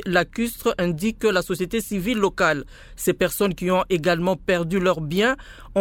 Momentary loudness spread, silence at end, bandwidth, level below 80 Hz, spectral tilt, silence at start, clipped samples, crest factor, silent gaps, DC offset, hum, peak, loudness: 5 LU; 0 s; 17.5 kHz; -44 dBFS; -5 dB/octave; 0 s; under 0.1%; 18 dB; none; under 0.1%; none; -4 dBFS; -22 LUFS